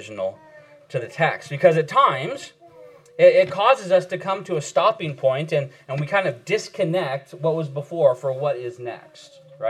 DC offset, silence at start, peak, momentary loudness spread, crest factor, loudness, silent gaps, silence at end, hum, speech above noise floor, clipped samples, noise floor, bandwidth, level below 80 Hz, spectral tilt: under 0.1%; 0 s; -2 dBFS; 14 LU; 20 dB; -21 LUFS; none; 0 s; none; 25 dB; under 0.1%; -47 dBFS; 11 kHz; -78 dBFS; -5.5 dB/octave